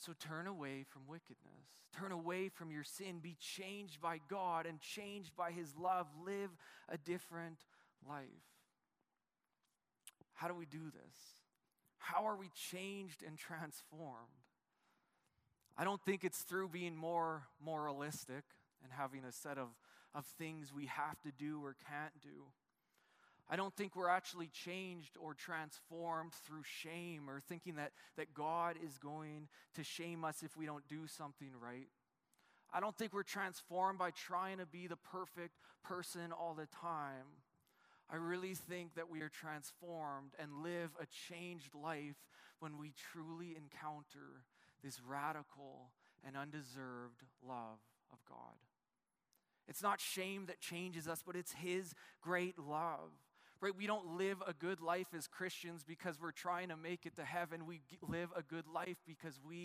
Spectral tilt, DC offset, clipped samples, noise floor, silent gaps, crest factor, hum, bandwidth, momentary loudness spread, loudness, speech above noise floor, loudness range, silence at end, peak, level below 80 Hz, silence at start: -4.5 dB/octave; under 0.1%; under 0.1%; under -90 dBFS; none; 24 dB; none; 15.5 kHz; 15 LU; -47 LUFS; over 43 dB; 8 LU; 0 s; -24 dBFS; -90 dBFS; 0 s